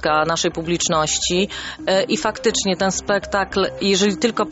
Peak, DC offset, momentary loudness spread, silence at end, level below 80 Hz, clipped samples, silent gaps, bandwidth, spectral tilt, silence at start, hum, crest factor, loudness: -4 dBFS; under 0.1%; 4 LU; 0 s; -44 dBFS; under 0.1%; none; 8.2 kHz; -3 dB/octave; 0 s; none; 16 dB; -19 LUFS